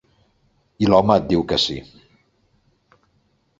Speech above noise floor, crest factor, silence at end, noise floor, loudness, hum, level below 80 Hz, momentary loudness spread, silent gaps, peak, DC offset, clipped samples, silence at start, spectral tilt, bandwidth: 46 dB; 22 dB; 1.75 s; -64 dBFS; -18 LUFS; none; -46 dBFS; 8 LU; none; 0 dBFS; under 0.1%; under 0.1%; 0.8 s; -6 dB/octave; 7.8 kHz